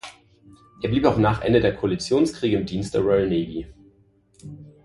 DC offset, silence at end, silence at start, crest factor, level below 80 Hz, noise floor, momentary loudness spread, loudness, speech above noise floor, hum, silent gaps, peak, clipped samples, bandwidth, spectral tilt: under 0.1%; 0.2 s; 0.05 s; 20 dB; -44 dBFS; -59 dBFS; 22 LU; -22 LUFS; 38 dB; none; none; -2 dBFS; under 0.1%; 11.5 kHz; -6.5 dB/octave